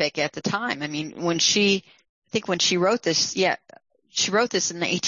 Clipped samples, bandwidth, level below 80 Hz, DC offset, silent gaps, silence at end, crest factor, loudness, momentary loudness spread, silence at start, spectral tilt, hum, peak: under 0.1%; 7.6 kHz; -66 dBFS; under 0.1%; 2.09-2.22 s; 0 s; 16 dB; -23 LUFS; 10 LU; 0 s; -2.5 dB/octave; none; -8 dBFS